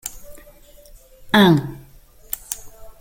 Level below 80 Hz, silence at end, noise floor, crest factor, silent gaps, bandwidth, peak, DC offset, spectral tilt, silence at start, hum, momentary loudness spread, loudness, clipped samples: -46 dBFS; 0.1 s; -46 dBFS; 20 dB; none; 17 kHz; -2 dBFS; under 0.1%; -5 dB/octave; 0.05 s; none; 19 LU; -19 LUFS; under 0.1%